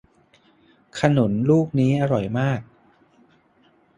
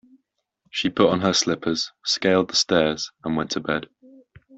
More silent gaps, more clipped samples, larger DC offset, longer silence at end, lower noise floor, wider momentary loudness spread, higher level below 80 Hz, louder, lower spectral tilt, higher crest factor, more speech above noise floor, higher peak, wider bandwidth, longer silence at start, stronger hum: neither; neither; neither; first, 1.35 s vs 0.7 s; second, -59 dBFS vs -73 dBFS; about the same, 7 LU vs 8 LU; about the same, -56 dBFS vs -58 dBFS; about the same, -21 LUFS vs -22 LUFS; first, -8 dB/octave vs -3.5 dB/octave; about the same, 20 dB vs 20 dB; second, 40 dB vs 51 dB; about the same, -2 dBFS vs -4 dBFS; first, 10.5 kHz vs 8.2 kHz; first, 0.95 s vs 0.75 s; neither